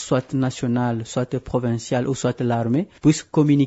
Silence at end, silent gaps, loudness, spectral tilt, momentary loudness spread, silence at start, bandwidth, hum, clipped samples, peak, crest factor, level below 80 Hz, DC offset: 0 s; none; -22 LUFS; -6.5 dB/octave; 5 LU; 0 s; 8 kHz; none; under 0.1%; -4 dBFS; 16 dB; -50 dBFS; under 0.1%